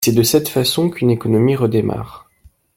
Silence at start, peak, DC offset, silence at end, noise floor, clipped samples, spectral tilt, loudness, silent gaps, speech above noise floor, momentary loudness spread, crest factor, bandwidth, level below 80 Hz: 0 s; -2 dBFS; under 0.1%; 0.6 s; -51 dBFS; under 0.1%; -5.5 dB/octave; -16 LUFS; none; 36 dB; 9 LU; 14 dB; 16.5 kHz; -48 dBFS